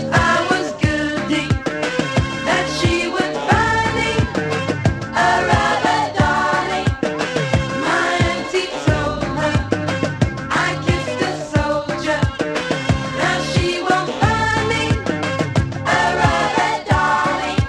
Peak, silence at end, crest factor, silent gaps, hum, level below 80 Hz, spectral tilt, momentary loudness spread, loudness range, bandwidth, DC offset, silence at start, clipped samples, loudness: 0 dBFS; 0 s; 18 dB; none; none; -32 dBFS; -5 dB/octave; 5 LU; 2 LU; 12 kHz; under 0.1%; 0 s; under 0.1%; -18 LUFS